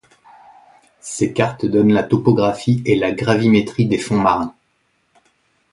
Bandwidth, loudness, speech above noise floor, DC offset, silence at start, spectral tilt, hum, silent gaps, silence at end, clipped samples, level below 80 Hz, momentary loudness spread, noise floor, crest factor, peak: 11.5 kHz; -17 LUFS; 48 dB; under 0.1%; 1.05 s; -6.5 dB/octave; none; none; 1.2 s; under 0.1%; -50 dBFS; 7 LU; -64 dBFS; 18 dB; 0 dBFS